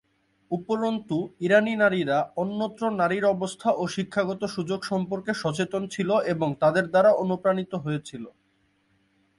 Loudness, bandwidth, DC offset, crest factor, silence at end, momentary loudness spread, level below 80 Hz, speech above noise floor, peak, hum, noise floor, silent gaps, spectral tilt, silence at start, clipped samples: -25 LUFS; 11.5 kHz; under 0.1%; 18 dB; 1.1 s; 9 LU; -66 dBFS; 43 dB; -8 dBFS; none; -68 dBFS; none; -6 dB/octave; 0.5 s; under 0.1%